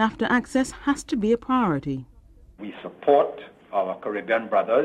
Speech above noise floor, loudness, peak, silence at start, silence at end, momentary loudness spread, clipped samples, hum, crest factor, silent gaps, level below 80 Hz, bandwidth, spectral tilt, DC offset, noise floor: 25 dB; -24 LUFS; -6 dBFS; 0 s; 0 s; 16 LU; under 0.1%; none; 18 dB; none; -52 dBFS; 12.5 kHz; -5.5 dB/octave; under 0.1%; -48 dBFS